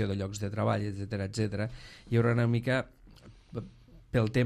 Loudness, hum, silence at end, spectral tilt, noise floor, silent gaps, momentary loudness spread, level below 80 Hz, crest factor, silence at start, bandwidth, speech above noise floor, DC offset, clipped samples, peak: -31 LUFS; none; 0 s; -7 dB/octave; -54 dBFS; none; 16 LU; -54 dBFS; 18 dB; 0 s; 10.5 kHz; 24 dB; under 0.1%; under 0.1%; -14 dBFS